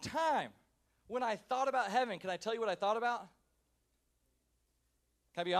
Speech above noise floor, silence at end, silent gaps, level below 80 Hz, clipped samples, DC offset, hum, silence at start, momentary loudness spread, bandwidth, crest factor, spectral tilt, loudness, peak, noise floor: 43 dB; 0 s; none; -76 dBFS; under 0.1%; under 0.1%; none; 0 s; 9 LU; 14.5 kHz; 20 dB; -4 dB/octave; -36 LUFS; -18 dBFS; -79 dBFS